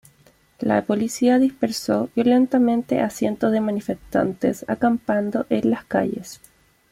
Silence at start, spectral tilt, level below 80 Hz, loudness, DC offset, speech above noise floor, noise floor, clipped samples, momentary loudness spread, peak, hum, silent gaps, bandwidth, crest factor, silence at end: 0.6 s; -6 dB/octave; -56 dBFS; -21 LUFS; under 0.1%; 36 dB; -56 dBFS; under 0.1%; 7 LU; -6 dBFS; none; none; 15.5 kHz; 16 dB; 0.55 s